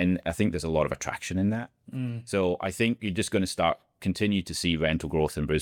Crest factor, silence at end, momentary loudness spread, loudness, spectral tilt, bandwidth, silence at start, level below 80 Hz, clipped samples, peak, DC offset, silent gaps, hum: 16 dB; 0 s; 6 LU; -28 LUFS; -5.5 dB/octave; 18 kHz; 0 s; -48 dBFS; under 0.1%; -10 dBFS; under 0.1%; none; none